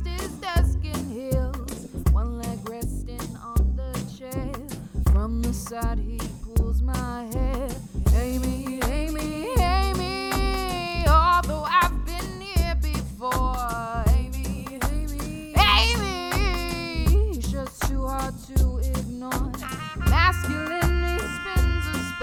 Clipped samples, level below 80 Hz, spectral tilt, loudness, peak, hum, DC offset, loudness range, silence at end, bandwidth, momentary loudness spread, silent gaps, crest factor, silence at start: under 0.1%; -26 dBFS; -5 dB/octave; -25 LUFS; -6 dBFS; none; under 0.1%; 5 LU; 0 s; 17.5 kHz; 12 LU; none; 18 dB; 0 s